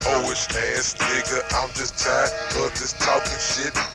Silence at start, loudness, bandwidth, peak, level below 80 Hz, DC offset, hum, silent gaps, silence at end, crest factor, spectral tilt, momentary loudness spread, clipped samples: 0 s; -22 LUFS; 13.5 kHz; -8 dBFS; -40 dBFS; under 0.1%; none; none; 0 s; 16 dB; -1.5 dB/octave; 4 LU; under 0.1%